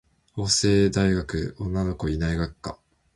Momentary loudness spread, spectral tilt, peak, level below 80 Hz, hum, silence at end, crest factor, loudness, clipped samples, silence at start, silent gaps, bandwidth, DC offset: 14 LU; -5 dB/octave; -6 dBFS; -38 dBFS; none; 0.4 s; 18 dB; -24 LUFS; under 0.1%; 0.35 s; none; 11.5 kHz; under 0.1%